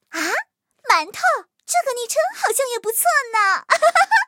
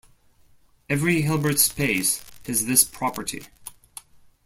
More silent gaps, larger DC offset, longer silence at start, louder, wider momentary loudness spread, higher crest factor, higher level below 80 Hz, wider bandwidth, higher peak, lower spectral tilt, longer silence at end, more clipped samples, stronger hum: neither; neither; second, 0.1 s vs 0.9 s; first, -19 LUFS vs -22 LUFS; second, 8 LU vs 24 LU; second, 18 dB vs 24 dB; second, -80 dBFS vs -54 dBFS; about the same, 17 kHz vs 16.5 kHz; about the same, -2 dBFS vs -2 dBFS; second, 1 dB/octave vs -3 dB/octave; second, 0 s vs 0.75 s; neither; neither